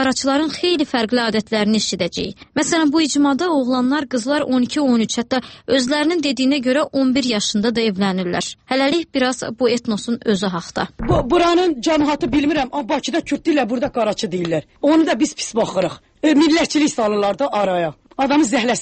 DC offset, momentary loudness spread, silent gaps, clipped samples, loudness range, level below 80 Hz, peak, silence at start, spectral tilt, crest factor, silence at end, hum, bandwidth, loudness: under 0.1%; 6 LU; none; under 0.1%; 2 LU; -44 dBFS; -4 dBFS; 0 s; -4 dB/octave; 14 dB; 0 s; none; 8.8 kHz; -18 LUFS